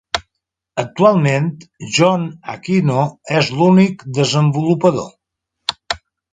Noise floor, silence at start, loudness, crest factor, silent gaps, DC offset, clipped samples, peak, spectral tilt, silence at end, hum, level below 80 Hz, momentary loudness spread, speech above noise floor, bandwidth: -78 dBFS; 0.15 s; -16 LUFS; 16 dB; none; under 0.1%; under 0.1%; 0 dBFS; -6 dB/octave; 0.35 s; none; -52 dBFS; 13 LU; 63 dB; 9.4 kHz